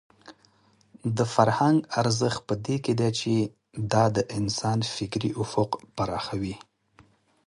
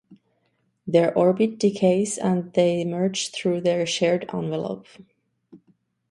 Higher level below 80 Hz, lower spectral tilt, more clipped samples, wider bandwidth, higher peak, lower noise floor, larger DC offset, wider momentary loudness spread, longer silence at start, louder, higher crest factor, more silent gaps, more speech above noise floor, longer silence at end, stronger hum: first, -56 dBFS vs -66 dBFS; about the same, -5.5 dB/octave vs -5.5 dB/octave; neither; about the same, 11.5 kHz vs 11.5 kHz; about the same, -4 dBFS vs -6 dBFS; second, -62 dBFS vs -70 dBFS; neither; about the same, 9 LU vs 8 LU; first, 0.25 s vs 0.1 s; second, -26 LUFS vs -22 LUFS; about the same, 22 dB vs 18 dB; neither; second, 36 dB vs 48 dB; first, 0.85 s vs 0.55 s; neither